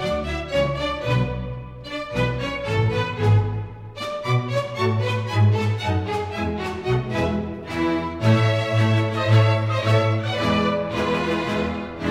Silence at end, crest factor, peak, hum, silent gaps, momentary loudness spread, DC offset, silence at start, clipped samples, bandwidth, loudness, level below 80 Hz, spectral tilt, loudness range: 0 s; 16 dB; -6 dBFS; none; none; 9 LU; under 0.1%; 0 s; under 0.1%; 9.6 kHz; -22 LUFS; -40 dBFS; -7 dB/octave; 4 LU